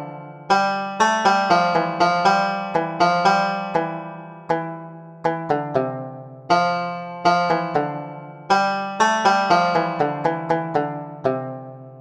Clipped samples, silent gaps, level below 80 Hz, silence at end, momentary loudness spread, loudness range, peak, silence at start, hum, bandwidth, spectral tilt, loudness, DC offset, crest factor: under 0.1%; none; -64 dBFS; 0 s; 17 LU; 6 LU; -4 dBFS; 0 s; none; 11 kHz; -5 dB/octave; -20 LUFS; under 0.1%; 18 dB